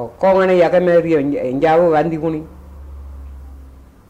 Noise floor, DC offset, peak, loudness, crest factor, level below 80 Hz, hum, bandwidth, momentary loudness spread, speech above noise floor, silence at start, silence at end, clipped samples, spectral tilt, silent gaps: -40 dBFS; under 0.1%; -4 dBFS; -14 LUFS; 12 dB; -38 dBFS; none; 8.4 kHz; 23 LU; 26 dB; 0 s; 0.4 s; under 0.1%; -8 dB/octave; none